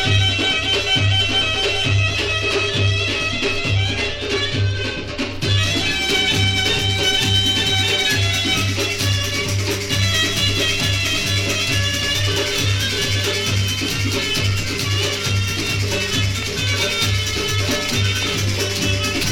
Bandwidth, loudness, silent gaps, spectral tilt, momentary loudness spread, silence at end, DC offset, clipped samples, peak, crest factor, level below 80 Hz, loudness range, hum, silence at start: 18 kHz; -18 LUFS; none; -3 dB/octave; 4 LU; 0 s; under 0.1%; under 0.1%; -4 dBFS; 14 dB; -34 dBFS; 3 LU; none; 0 s